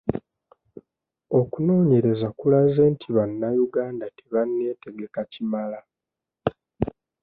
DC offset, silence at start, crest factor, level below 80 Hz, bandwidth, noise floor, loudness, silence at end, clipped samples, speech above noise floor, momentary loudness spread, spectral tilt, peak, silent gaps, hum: under 0.1%; 0.05 s; 18 dB; -54 dBFS; 4.5 kHz; -87 dBFS; -23 LUFS; 0.35 s; under 0.1%; 65 dB; 14 LU; -12.5 dB/octave; -6 dBFS; none; none